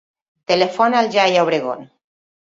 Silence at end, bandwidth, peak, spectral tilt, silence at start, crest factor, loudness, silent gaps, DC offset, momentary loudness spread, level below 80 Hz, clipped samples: 0.6 s; 7.8 kHz; -2 dBFS; -4.5 dB/octave; 0.5 s; 16 dB; -17 LUFS; none; under 0.1%; 14 LU; -64 dBFS; under 0.1%